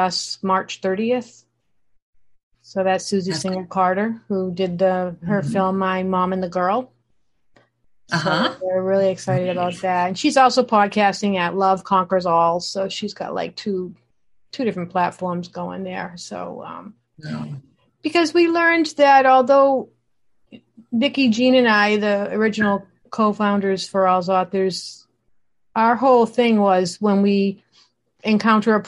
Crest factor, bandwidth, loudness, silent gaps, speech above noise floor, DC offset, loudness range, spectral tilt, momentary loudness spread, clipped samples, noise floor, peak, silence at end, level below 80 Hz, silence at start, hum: 18 dB; 11.5 kHz; -19 LUFS; 2.02-2.13 s, 2.43-2.51 s; 48 dB; under 0.1%; 9 LU; -5.5 dB/octave; 15 LU; under 0.1%; -66 dBFS; -2 dBFS; 0 s; -64 dBFS; 0 s; none